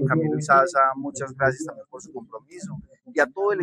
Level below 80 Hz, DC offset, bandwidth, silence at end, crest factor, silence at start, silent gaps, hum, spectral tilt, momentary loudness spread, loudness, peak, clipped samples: -60 dBFS; under 0.1%; 10.5 kHz; 0 s; 20 dB; 0 s; none; none; -6 dB/octave; 21 LU; -22 LUFS; -4 dBFS; under 0.1%